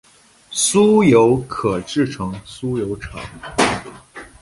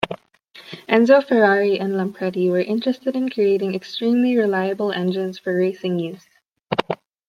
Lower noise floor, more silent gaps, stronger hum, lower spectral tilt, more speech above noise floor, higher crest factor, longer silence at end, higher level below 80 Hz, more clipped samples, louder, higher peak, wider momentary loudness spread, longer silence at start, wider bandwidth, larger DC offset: second, -43 dBFS vs -48 dBFS; neither; neither; second, -4.5 dB/octave vs -7 dB/octave; about the same, 26 dB vs 29 dB; about the same, 16 dB vs 18 dB; second, 0.15 s vs 0.35 s; first, -44 dBFS vs -66 dBFS; neither; first, -17 LUFS vs -20 LUFS; about the same, -2 dBFS vs -2 dBFS; first, 19 LU vs 11 LU; first, 0.5 s vs 0 s; second, 11.5 kHz vs 13.5 kHz; neither